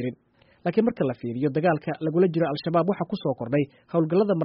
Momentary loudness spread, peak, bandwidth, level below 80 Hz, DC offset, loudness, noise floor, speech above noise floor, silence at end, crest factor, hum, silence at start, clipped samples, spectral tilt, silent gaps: 6 LU; -10 dBFS; 5.6 kHz; -64 dBFS; under 0.1%; -25 LUFS; -60 dBFS; 36 dB; 0 s; 16 dB; none; 0 s; under 0.1%; -7 dB/octave; none